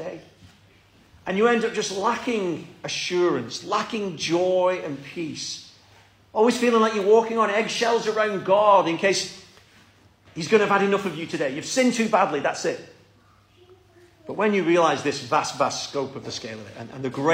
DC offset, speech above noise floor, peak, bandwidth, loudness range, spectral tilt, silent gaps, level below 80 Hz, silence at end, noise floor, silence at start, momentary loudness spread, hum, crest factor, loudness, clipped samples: under 0.1%; 34 dB; -4 dBFS; 15.5 kHz; 5 LU; -4 dB/octave; none; -66 dBFS; 0 s; -57 dBFS; 0 s; 14 LU; none; 20 dB; -23 LUFS; under 0.1%